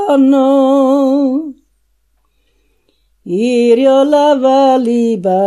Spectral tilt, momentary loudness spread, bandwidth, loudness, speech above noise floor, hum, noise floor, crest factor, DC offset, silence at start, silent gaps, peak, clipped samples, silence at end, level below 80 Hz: -6 dB/octave; 7 LU; 11.5 kHz; -11 LUFS; 50 dB; none; -60 dBFS; 12 dB; under 0.1%; 0 s; none; 0 dBFS; under 0.1%; 0 s; -60 dBFS